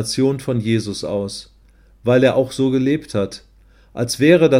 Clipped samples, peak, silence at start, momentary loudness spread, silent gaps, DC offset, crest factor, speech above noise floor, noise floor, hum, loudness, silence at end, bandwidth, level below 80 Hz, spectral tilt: under 0.1%; 0 dBFS; 0 s; 13 LU; none; under 0.1%; 18 dB; 33 dB; -50 dBFS; none; -18 LUFS; 0 s; 16 kHz; -50 dBFS; -6 dB/octave